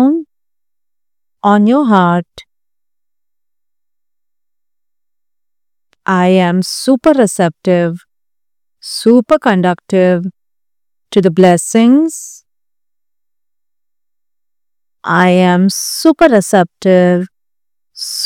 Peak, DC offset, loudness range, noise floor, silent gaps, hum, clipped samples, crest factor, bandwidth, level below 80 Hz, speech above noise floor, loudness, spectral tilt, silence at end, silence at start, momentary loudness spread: 0 dBFS; under 0.1%; 7 LU; -88 dBFS; none; 50 Hz at -50 dBFS; 0.3%; 14 dB; 16 kHz; -54 dBFS; 78 dB; -11 LUFS; -5.5 dB/octave; 0 s; 0 s; 13 LU